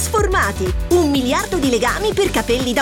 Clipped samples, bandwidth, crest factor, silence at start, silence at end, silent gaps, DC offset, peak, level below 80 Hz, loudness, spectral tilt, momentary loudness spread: under 0.1%; 19 kHz; 14 dB; 0 s; 0 s; none; under 0.1%; -4 dBFS; -28 dBFS; -17 LUFS; -4.5 dB/octave; 3 LU